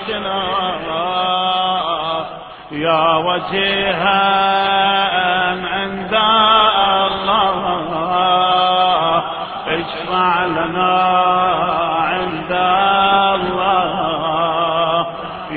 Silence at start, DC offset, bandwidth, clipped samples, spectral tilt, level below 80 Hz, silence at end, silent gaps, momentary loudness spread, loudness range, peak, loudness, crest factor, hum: 0 s; under 0.1%; 5 kHz; under 0.1%; -7.5 dB/octave; -48 dBFS; 0 s; none; 8 LU; 3 LU; 0 dBFS; -15 LUFS; 16 dB; none